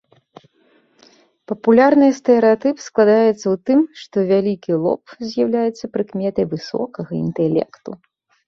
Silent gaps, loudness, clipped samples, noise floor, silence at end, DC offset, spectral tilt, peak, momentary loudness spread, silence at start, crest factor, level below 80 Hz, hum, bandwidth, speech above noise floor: none; -17 LUFS; under 0.1%; -58 dBFS; 0.5 s; under 0.1%; -7 dB/octave; -2 dBFS; 12 LU; 1.5 s; 16 dB; -60 dBFS; none; 7.4 kHz; 41 dB